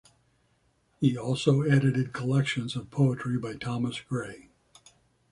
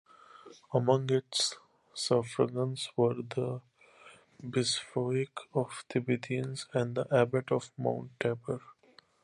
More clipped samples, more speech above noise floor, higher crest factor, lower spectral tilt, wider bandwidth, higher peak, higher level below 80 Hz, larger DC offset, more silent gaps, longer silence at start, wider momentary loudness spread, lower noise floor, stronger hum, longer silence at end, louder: neither; first, 42 dB vs 31 dB; about the same, 20 dB vs 22 dB; first, -7 dB/octave vs -5 dB/octave; about the same, 11 kHz vs 11.5 kHz; about the same, -10 dBFS vs -12 dBFS; first, -62 dBFS vs -72 dBFS; neither; neither; first, 1 s vs 0.35 s; about the same, 10 LU vs 9 LU; first, -69 dBFS vs -63 dBFS; neither; first, 0.9 s vs 0.5 s; first, -28 LUFS vs -32 LUFS